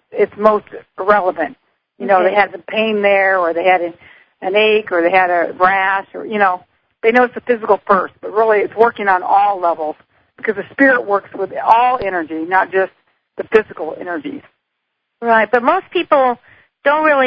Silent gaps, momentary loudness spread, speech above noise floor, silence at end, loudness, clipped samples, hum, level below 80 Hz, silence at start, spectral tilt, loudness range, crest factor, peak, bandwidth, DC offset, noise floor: none; 12 LU; 59 dB; 0 s; -15 LUFS; under 0.1%; none; -58 dBFS; 0.1 s; -7 dB/octave; 3 LU; 16 dB; 0 dBFS; 5.8 kHz; under 0.1%; -73 dBFS